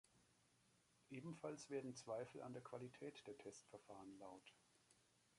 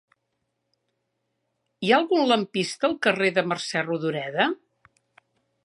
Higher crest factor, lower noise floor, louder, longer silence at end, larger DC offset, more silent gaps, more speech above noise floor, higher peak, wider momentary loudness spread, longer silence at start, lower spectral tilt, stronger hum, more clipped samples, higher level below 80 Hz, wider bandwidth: about the same, 20 dB vs 22 dB; about the same, -79 dBFS vs -77 dBFS; second, -56 LUFS vs -24 LUFS; second, 0.05 s vs 1.1 s; neither; neither; second, 24 dB vs 54 dB; second, -38 dBFS vs -4 dBFS; first, 10 LU vs 7 LU; second, 0.05 s vs 1.8 s; about the same, -5 dB/octave vs -4.5 dB/octave; neither; neither; second, -90 dBFS vs -74 dBFS; about the same, 11.5 kHz vs 11.5 kHz